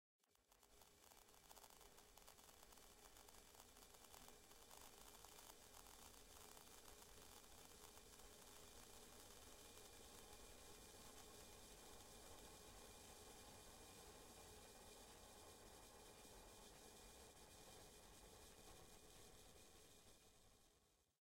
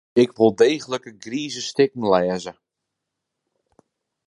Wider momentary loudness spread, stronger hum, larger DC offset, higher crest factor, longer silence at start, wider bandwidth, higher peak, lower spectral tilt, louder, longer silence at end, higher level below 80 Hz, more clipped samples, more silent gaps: second, 4 LU vs 13 LU; neither; neither; about the same, 20 dB vs 20 dB; about the same, 0.2 s vs 0.15 s; first, 16 kHz vs 11 kHz; second, -44 dBFS vs -2 dBFS; second, -2 dB/octave vs -5 dB/octave; second, -63 LUFS vs -21 LUFS; second, 0.05 s vs 1.75 s; second, -74 dBFS vs -64 dBFS; neither; neither